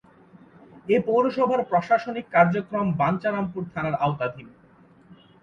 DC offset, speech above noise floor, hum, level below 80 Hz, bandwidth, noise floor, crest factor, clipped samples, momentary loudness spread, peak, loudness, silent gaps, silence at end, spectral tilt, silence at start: under 0.1%; 31 dB; none; -60 dBFS; 7.2 kHz; -54 dBFS; 20 dB; under 0.1%; 10 LU; -4 dBFS; -24 LUFS; none; 0.3 s; -8.5 dB/octave; 0.75 s